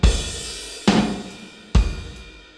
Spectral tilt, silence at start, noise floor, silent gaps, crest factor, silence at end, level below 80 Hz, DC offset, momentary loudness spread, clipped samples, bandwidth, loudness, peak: -5 dB/octave; 0 s; -40 dBFS; none; 20 dB; 0.15 s; -24 dBFS; under 0.1%; 19 LU; under 0.1%; 11 kHz; -23 LUFS; -2 dBFS